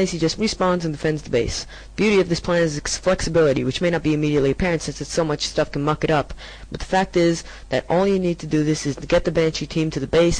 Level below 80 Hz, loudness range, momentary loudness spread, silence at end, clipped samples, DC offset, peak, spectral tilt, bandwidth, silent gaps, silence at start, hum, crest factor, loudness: -38 dBFS; 2 LU; 7 LU; 0 s; under 0.1%; under 0.1%; -8 dBFS; -5 dB/octave; 10.5 kHz; none; 0 s; none; 12 dB; -21 LUFS